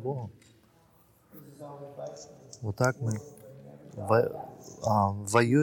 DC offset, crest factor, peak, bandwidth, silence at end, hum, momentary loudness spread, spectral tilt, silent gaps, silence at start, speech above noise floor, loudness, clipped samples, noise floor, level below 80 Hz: under 0.1%; 20 dB; -10 dBFS; 18.5 kHz; 0 s; none; 23 LU; -6 dB/octave; none; 0 s; 33 dB; -29 LUFS; under 0.1%; -62 dBFS; -66 dBFS